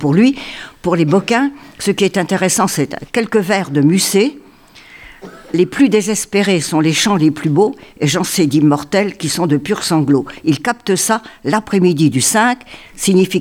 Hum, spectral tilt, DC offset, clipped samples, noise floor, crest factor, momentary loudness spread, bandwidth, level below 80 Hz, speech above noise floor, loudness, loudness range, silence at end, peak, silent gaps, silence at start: none; -4.5 dB/octave; under 0.1%; under 0.1%; -42 dBFS; 14 dB; 7 LU; 19 kHz; -50 dBFS; 28 dB; -14 LUFS; 2 LU; 0 s; 0 dBFS; none; 0 s